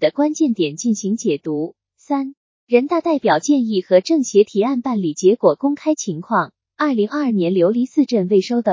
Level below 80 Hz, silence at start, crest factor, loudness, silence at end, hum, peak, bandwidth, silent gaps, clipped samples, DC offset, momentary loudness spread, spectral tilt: -74 dBFS; 0 s; 16 dB; -18 LUFS; 0 s; none; 0 dBFS; 7.6 kHz; 2.37-2.67 s; under 0.1%; under 0.1%; 8 LU; -5.5 dB/octave